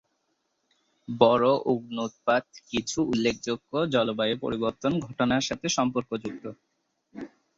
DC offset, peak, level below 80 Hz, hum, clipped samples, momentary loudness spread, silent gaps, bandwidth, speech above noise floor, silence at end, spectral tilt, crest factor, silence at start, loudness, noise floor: under 0.1%; -4 dBFS; -60 dBFS; none; under 0.1%; 15 LU; none; 8 kHz; 49 dB; 0.3 s; -4.5 dB/octave; 24 dB; 1.1 s; -26 LUFS; -75 dBFS